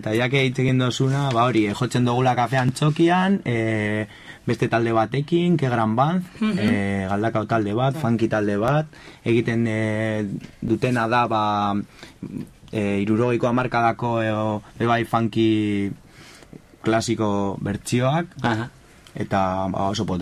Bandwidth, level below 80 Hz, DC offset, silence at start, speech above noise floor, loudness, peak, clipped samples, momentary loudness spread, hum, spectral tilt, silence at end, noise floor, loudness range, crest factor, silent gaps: 13 kHz; -50 dBFS; under 0.1%; 0 s; 24 dB; -22 LUFS; -6 dBFS; under 0.1%; 9 LU; none; -6.5 dB/octave; 0 s; -45 dBFS; 3 LU; 16 dB; none